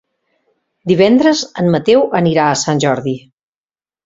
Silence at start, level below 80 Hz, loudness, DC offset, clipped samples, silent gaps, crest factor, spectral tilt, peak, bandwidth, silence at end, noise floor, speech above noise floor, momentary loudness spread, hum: 0.85 s; -52 dBFS; -13 LUFS; under 0.1%; under 0.1%; none; 14 dB; -5.5 dB/octave; 0 dBFS; 7.8 kHz; 0.9 s; under -90 dBFS; over 78 dB; 11 LU; none